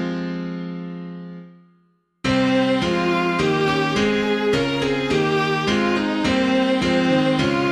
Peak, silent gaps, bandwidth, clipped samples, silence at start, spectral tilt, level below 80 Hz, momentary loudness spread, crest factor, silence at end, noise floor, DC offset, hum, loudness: -6 dBFS; none; 11.5 kHz; under 0.1%; 0 s; -5.5 dB/octave; -46 dBFS; 13 LU; 14 dB; 0 s; -62 dBFS; under 0.1%; none; -20 LUFS